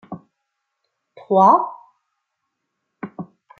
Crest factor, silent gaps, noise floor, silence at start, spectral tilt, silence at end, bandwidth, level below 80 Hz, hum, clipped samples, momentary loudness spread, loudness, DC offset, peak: 20 dB; none; -77 dBFS; 0.1 s; -8.5 dB/octave; 0.35 s; 6.8 kHz; -74 dBFS; none; under 0.1%; 25 LU; -15 LUFS; under 0.1%; -2 dBFS